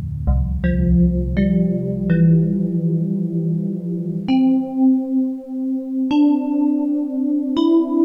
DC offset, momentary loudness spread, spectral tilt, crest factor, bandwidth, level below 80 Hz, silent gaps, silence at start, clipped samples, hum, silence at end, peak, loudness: under 0.1%; 7 LU; -10.5 dB/octave; 12 dB; 5.4 kHz; -28 dBFS; none; 0 s; under 0.1%; none; 0 s; -6 dBFS; -19 LUFS